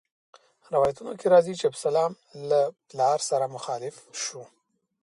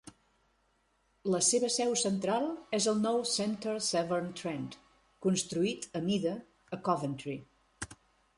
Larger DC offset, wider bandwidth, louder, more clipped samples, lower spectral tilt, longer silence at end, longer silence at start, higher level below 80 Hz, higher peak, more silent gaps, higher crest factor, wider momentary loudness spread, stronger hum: neither; about the same, 11.5 kHz vs 11.5 kHz; first, -26 LUFS vs -32 LUFS; neither; about the same, -4 dB/octave vs -4 dB/octave; first, 0.6 s vs 0.45 s; first, 0.7 s vs 0.05 s; about the same, -68 dBFS vs -68 dBFS; first, -8 dBFS vs -14 dBFS; neither; about the same, 20 dB vs 18 dB; second, 13 LU vs 16 LU; neither